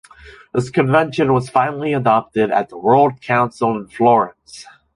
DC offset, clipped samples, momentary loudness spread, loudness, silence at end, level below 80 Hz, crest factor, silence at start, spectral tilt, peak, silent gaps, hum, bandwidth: under 0.1%; under 0.1%; 9 LU; -17 LUFS; 0.3 s; -54 dBFS; 16 dB; 0.25 s; -7 dB/octave; -2 dBFS; none; none; 11.5 kHz